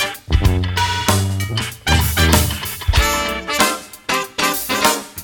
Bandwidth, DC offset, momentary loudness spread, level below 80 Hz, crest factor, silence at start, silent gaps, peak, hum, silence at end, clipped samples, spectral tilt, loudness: 19 kHz; under 0.1%; 7 LU; -26 dBFS; 18 dB; 0 s; none; 0 dBFS; none; 0 s; under 0.1%; -3.5 dB/octave; -17 LUFS